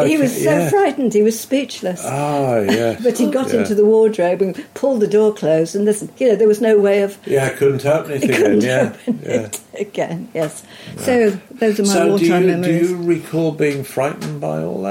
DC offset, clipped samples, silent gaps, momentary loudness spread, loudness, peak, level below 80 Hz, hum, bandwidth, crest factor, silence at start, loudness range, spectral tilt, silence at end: under 0.1%; under 0.1%; none; 10 LU; -16 LUFS; -4 dBFS; -60 dBFS; none; 16.5 kHz; 12 dB; 0 s; 3 LU; -5.5 dB/octave; 0 s